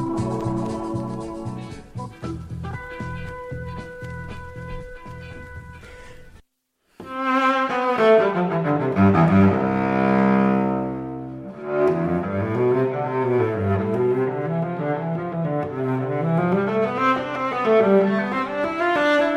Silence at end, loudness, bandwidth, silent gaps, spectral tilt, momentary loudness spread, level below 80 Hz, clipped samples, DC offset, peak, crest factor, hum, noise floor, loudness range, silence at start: 0 s; -21 LUFS; 10.5 kHz; none; -8 dB/octave; 18 LU; -46 dBFS; under 0.1%; under 0.1%; -6 dBFS; 16 dB; none; -69 dBFS; 16 LU; 0 s